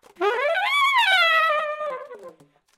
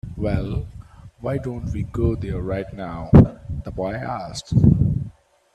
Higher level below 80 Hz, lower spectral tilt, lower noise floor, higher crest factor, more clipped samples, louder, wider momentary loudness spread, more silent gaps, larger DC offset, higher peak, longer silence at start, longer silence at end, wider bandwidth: second, -78 dBFS vs -32 dBFS; second, 0 dB/octave vs -8.5 dB/octave; first, -50 dBFS vs -42 dBFS; about the same, 16 dB vs 20 dB; neither; about the same, -19 LUFS vs -21 LUFS; second, 14 LU vs 17 LU; neither; neither; second, -8 dBFS vs 0 dBFS; first, 0.2 s vs 0.05 s; about the same, 0.5 s vs 0.45 s; first, 16.5 kHz vs 9.4 kHz